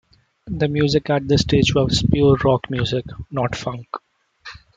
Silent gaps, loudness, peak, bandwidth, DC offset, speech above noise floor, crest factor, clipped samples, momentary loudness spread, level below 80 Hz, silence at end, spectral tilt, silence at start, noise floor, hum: none; -19 LUFS; -2 dBFS; 9 kHz; under 0.1%; 24 dB; 18 dB; under 0.1%; 16 LU; -38 dBFS; 0.2 s; -6 dB/octave; 0.45 s; -43 dBFS; none